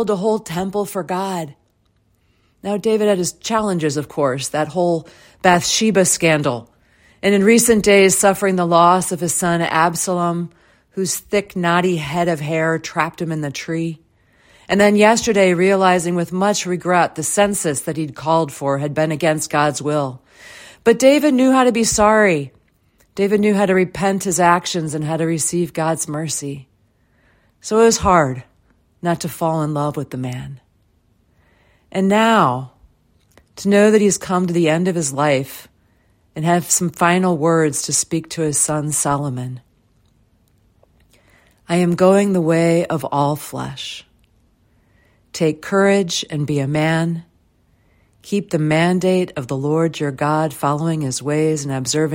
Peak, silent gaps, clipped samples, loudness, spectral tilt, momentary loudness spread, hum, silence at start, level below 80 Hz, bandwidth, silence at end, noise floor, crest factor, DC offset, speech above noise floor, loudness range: 0 dBFS; none; under 0.1%; -17 LUFS; -4.5 dB/octave; 12 LU; none; 0 s; -50 dBFS; 16.5 kHz; 0 s; -61 dBFS; 18 dB; under 0.1%; 44 dB; 7 LU